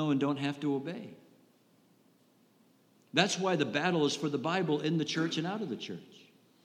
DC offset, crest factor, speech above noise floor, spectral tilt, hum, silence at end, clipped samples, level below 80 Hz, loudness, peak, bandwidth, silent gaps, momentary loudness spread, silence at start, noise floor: under 0.1%; 24 dB; 35 dB; -5 dB/octave; none; 0.45 s; under 0.1%; -88 dBFS; -32 LUFS; -10 dBFS; 12 kHz; none; 13 LU; 0 s; -66 dBFS